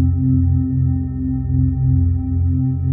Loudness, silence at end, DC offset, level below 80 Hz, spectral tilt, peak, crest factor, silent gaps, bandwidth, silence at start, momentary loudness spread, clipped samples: -18 LUFS; 0 s; under 0.1%; -26 dBFS; -16.5 dB/octave; -6 dBFS; 10 dB; none; 1.9 kHz; 0 s; 4 LU; under 0.1%